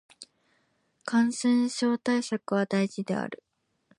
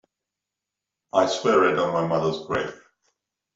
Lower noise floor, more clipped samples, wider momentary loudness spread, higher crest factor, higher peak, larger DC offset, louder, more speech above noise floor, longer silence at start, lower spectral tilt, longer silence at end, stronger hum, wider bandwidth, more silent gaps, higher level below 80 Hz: second, -71 dBFS vs -86 dBFS; neither; about the same, 10 LU vs 9 LU; about the same, 16 dB vs 20 dB; second, -14 dBFS vs -6 dBFS; neither; second, -27 LUFS vs -23 LUFS; second, 45 dB vs 64 dB; second, 0.2 s vs 1.15 s; about the same, -5 dB/octave vs -5 dB/octave; second, 0.65 s vs 0.8 s; neither; first, 11.5 kHz vs 7.8 kHz; neither; second, -78 dBFS vs -64 dBFS